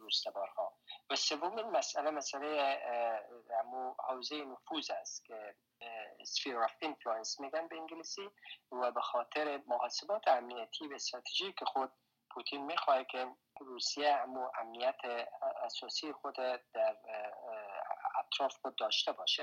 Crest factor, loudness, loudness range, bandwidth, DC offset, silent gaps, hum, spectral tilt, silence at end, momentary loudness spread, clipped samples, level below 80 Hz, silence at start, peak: 20 dB; -38 LUFS; 4 LU; 16 kHz; under 0.1%; none; none; -0.5 dB/octave; 0 s; 12 LU; under 0.1%; under -90 dBFS; 0 s; -18 dBFS